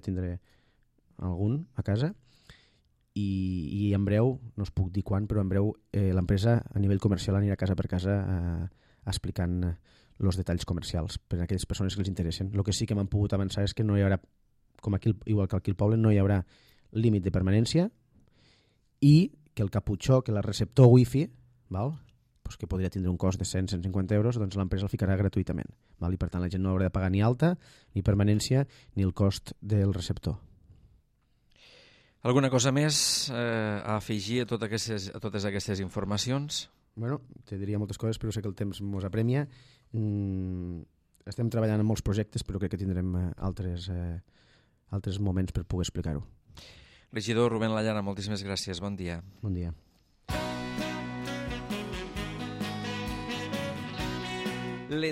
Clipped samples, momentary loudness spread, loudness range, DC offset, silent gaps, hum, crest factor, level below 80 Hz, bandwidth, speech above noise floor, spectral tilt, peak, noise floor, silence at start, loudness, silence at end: under 0.1%; 11 LU; 8 LU; under 0.1%; none; none; 22 dB; -48 dBFS; 14.5 kHz; 41 dB; -6 dB/octave; -8 dBFS; -69 dBFS; 0.05 s; -30 LUFS; 0 s